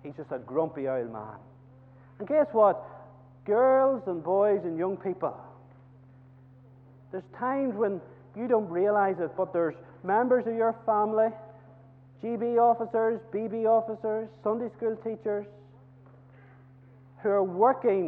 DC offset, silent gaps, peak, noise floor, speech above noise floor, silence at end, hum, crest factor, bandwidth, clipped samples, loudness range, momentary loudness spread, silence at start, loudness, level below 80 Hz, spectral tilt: under 0.1%; none; -10 dBFS; -54 dBFS; 27 dB; 0 s; none; 18 dB; 4 kHz; under 0.1%; 8 LU; 16 LU; 0.05 s; -28 LUFS; -72 dBFS; -10.5 dB/octave